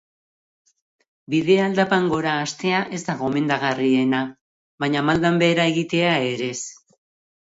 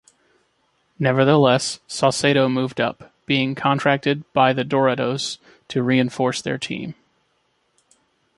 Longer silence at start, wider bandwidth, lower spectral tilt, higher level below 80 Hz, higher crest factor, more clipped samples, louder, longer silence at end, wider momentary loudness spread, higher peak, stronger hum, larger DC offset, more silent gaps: first, 1.3 s vs 1 s; second, 8 kHz vs 11.5 kHz; about the same, -5 dB/octave vs -5 dB/octave; about the same, -58 dBFS vs -62 dBFS; about the same, 18 dB vs 20 dB; neither; about the same, -21 LUFS vs -20 LUFS; second, 0.85 s vs 1.45 s; second, 9 LU vs 12 LU; about the same, -4 dBFS vs -2 dBFS; neither; neither; first, 4.41-4.78 s vs none